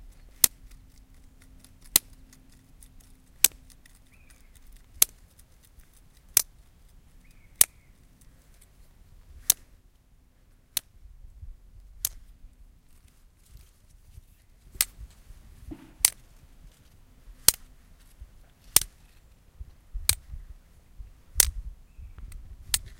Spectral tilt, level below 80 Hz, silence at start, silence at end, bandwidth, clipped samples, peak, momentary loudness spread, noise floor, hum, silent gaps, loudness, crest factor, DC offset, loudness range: 0.5 dB/octave; -48 dBFS; 0.45 s; 0.05 s; 17 kHz; under 0.1%; 0 dBFS; 25 LU; -59 dBFS; none; none; -25 LUFS; 34 dB; under 0.1%; 11 LU